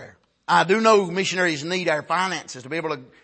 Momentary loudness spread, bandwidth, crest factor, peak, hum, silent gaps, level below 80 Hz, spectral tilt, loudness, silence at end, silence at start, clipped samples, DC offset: 13 LU; 8.8 kHz; 18 dB; -4 dBFS; none; none; -70 dBFS; -4 dB/octave; -21 LUFS; 0.2 s; 0 s; under 0.1%; under 0.1%